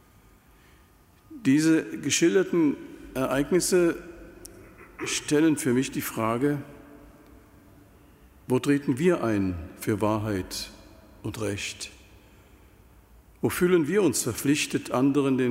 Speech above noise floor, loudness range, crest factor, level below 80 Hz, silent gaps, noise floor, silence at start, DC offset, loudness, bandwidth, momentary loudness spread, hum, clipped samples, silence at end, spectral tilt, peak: 32 dB; 7 LU; 18 dB; -54 dBFS; none; -57 dBFS; 1.3 s; under 0.1%; -25 LUFS; 16 kHz; 16 LU; none; under 0.1%; 0 s; -5 dB/octave; -10 dBFS